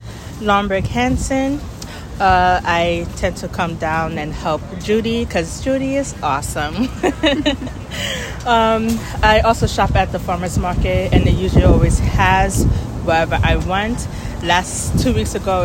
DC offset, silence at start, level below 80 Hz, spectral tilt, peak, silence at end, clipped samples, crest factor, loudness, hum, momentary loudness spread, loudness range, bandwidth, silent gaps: under 0.1%; 0 s; -26 dBFS; -5 dB/octave; 0 dBFS; 0 s; under 0.1%; 16 dB; -17 LUFS; none; 9 LU; 4 LU; 16.5 kHz; none